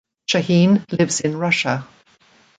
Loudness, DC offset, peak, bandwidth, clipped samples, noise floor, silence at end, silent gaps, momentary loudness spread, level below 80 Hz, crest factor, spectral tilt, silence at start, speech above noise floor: -18 LUFS; under 0.1%; -4 dBFS; 9.4 kHz; under 0.1%; -55 dBFS; 0.75 s; none; 7 LU; -60 dBFS; 16 dB; -5 dB/octave; 0.3 s; 37 dB